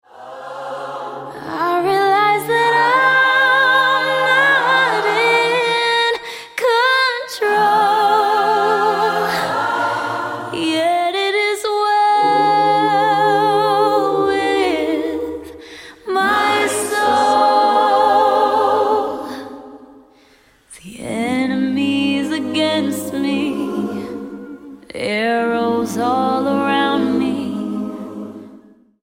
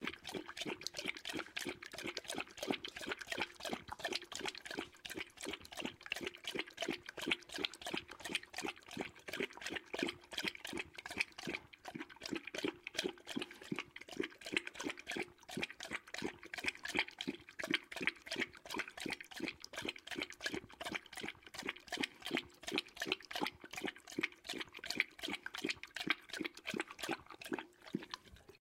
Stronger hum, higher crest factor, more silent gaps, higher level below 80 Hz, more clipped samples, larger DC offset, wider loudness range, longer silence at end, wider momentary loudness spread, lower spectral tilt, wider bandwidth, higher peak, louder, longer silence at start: neither; second, 14 dB vs 28 dB; neither; first, -58 dBFS vs -74 dBFS; neither; neither; first, 7 LU vs 3 LU; first, 0.45 s vs 0.05 s; first, 16 LU vs 7 LU; about the same, -3.5 dB/octave vs -2.5 dB/octave; about the same, 16.5 kHz vs 16 kHz; first, -2 dBFS vs -16 dBFS; first, -16 LUFS vs -43 LUFS; first, 0.15 s vs 0 s